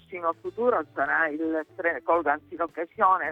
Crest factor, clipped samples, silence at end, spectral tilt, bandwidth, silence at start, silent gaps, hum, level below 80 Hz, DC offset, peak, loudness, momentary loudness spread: 18 dB; under 0.1%; 0 s; -7 dB/octave; 4.3 kHz; 0.1 s; none; none; -66 dBFS; under 0.1%; -8 dBFS; -26 LUFS; 7 LU